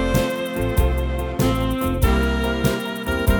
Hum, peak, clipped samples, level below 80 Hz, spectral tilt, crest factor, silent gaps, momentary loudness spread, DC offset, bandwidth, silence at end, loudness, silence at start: none; -4 dBFS; under 0.1%; -24 dBFS; -6 dB/octave; 16 dB; none; 5 LU; under 0.1%; over 20 kHz; 0 s; -21 LUFS; 0 s